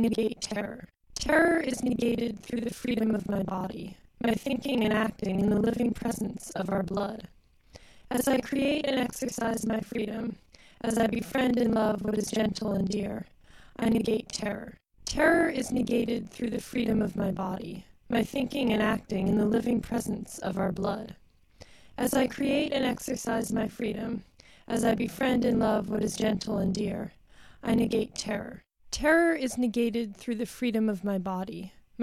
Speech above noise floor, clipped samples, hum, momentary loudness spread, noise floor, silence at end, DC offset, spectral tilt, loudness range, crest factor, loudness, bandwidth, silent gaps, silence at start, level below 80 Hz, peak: 26 dB; under 0.1%; none; 11 LU; -55 dBFS; 0 s; under 0.1%; -5 dB/octave; 2 LU; 18 dB; -29 LUFS; 15 kHz; none; 0 s; -52 dBFS; -10 dBFS